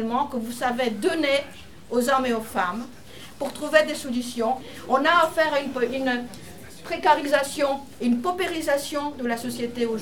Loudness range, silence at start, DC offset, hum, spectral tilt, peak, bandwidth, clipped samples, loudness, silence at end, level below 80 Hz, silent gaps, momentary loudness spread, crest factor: 2 LU; 0 s; 0.6%; none; -3.5 dB/octave; -4 dBFS; 19 kHz; under 0.1%; -24 LUFS; 0 s; -56 dBFS; none; 13 LU; 20 dB